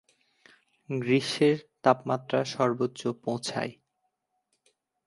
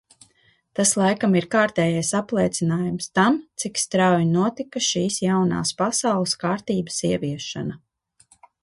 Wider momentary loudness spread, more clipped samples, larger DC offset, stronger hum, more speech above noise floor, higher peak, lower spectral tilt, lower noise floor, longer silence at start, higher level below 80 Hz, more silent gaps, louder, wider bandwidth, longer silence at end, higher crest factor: about the same, 9 LU vs 7 LU; neither; neither; neither; first, 52 dB vs 40 dB; about the same, -6 dBFS vs -6 dBFS; about the same, -5.5 dB/octave vs -4.5 dB/octave; first, -79 dBFS vs -62 dBFS; about the same, 0.9 s vs 0.8 s; second, -74 dBFS vs -58 dBFS; neither; second, -28 LUFS vs -22 LUFS; about the same, 11.5 kHz vs 11.5 kHz; first, 1.35 s vs 0.85 s; first, 24 dB vs 18 dB